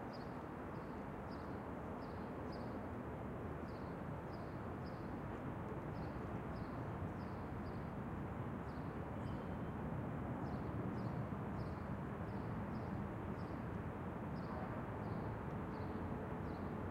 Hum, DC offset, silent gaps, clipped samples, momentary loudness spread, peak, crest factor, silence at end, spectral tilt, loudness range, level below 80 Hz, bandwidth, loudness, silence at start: none; under 0.1%; none; under 0.1%; 3 LU; -32 dBFS; 14 dB; 0 s; -8.5 dB/octave; 2 LU; -58 dBFS; 16 kHz; -46 LUFS; 0 s